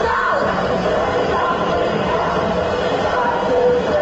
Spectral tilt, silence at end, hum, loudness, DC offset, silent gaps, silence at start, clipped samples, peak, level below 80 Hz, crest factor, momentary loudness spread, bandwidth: -3.5 dB/octave; 0 s; none; -18 LUFS; under 0.1%; none; 0 s; under 0.1%; -6 dBFS; -38 dBFS; 12 dB; 3 LU; 8 kHz